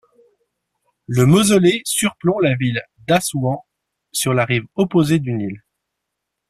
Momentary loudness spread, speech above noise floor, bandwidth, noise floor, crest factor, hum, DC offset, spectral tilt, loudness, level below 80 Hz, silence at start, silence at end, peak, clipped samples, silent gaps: 12 LU; 62 dB; 15.5 kHz; -79 dBFS; 16 dB; none; under 0.1%; -5 dB/octave; -17 LUFS; -52 dBFS; 1.1 s; 0.9 s; -2 dBFS; under 0.1%; none